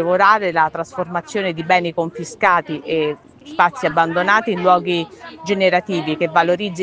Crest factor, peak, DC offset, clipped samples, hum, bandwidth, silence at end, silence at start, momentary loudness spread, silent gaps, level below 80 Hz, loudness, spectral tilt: 18 dB; 0 dBFS; under 0.1%; under 0.1%; none; 9.6 kHz; 0 s; 0 s; 9 LU; none; -60 dBFS; -17 LUFS; -5 dB/octave